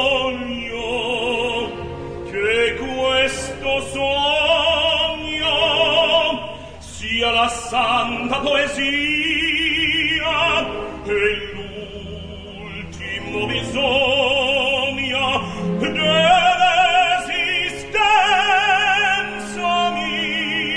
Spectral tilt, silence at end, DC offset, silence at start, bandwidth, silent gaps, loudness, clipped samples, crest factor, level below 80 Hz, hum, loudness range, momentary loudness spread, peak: -3 dB/octave; 0 s; under 0.1%; 0 s; 10.5 kHz; none; -18 LUFS; under 0.1%; 16 dB; -42 dBFS; none; 5 LU; 15 LU; -4 dBFS